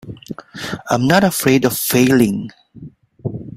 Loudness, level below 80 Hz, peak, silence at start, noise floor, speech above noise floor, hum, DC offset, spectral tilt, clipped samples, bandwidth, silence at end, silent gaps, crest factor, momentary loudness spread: -15 LUFS; -50 dBFS; 0 dBFS; 0.05 s; -39 dBFS; 24 dB; none; under 0.1%; -5 dB/octave; under 0.1%; 16.5 kHz; 0 s; none; 16 dB; 19 LU